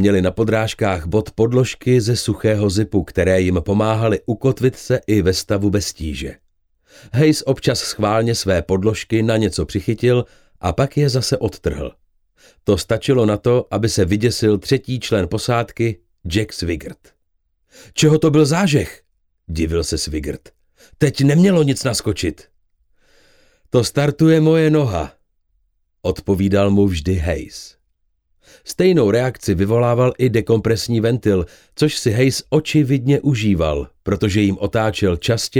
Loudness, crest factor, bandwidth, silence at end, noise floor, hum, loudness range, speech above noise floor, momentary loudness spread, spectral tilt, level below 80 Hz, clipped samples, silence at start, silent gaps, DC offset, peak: -17 LUFS; 16 dB; 17 kHz; 0 s; -66 dBFS; none; 3 LU; 49 dB; 10 LU; -6 dB/octave; -38 dBFS; under 0.1%; 0 s; none; under 0.1%; -2 dBFS